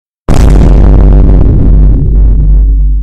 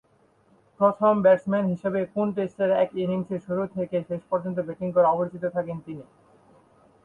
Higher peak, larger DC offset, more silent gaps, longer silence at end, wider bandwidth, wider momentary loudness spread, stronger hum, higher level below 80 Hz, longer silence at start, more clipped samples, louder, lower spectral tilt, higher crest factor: first, 0 dBFS vs -8 dBFS; neither; neither; second, 0 s vs 1 s; about the same, 6.8 kHz vs 7 kHz; second, 3 LU vs 10 LU; neither; first, -4 dBFS vs -66 dBFS; second, 0.3 s vs 0.8 s; first, 8% vs under 0.1%; first, -7 LUFS vs -25 LUFS; about the same, -8.5 dB/octave vs -9 dB/octave; second, 2 dB vs 18 dB